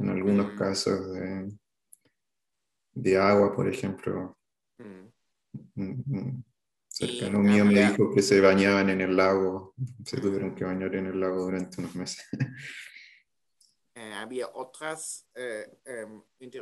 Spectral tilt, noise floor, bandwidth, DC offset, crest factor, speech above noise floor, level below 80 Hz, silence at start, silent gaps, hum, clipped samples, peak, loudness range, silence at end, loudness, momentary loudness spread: -5.5 dB/octave; -86 dBFS; 12.5 kHz; under 0.1%; 22 dB; 60 dB; -68 dBFS; 0 s; none; none; under 0.1%; -6 dBFS; 15 LU; 0 s; -27 LUFS; 21 LU